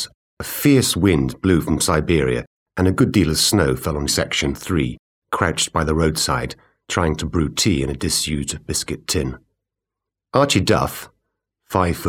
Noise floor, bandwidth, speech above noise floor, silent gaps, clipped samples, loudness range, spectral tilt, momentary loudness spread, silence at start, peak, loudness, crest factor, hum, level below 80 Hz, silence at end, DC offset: -85 dBFS; 17.5 kHz; 66 dB; 0.14-0.37 s, 2.47-2.66 s, 4.99-5.22 s; under 0.1%; 4 LU; -4.5 dB/octave; 10 LU; 0 s; 0 dBFS; -19 LUFS; 20 dB; none; -36 dBFS; 0 s; under 0.1%